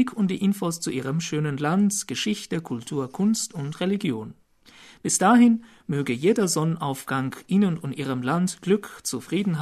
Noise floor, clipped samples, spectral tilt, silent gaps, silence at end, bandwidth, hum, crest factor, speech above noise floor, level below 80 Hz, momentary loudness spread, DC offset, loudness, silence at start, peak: -51 dBFS; under 0.1%; -5 dB/octave; none; 0 s; 13.5 kHz; none; 18 dB; 28 dB; -64 dBFS; 10 LU; under 0.1%; -24 LUFS; 0 s; -6 dBFS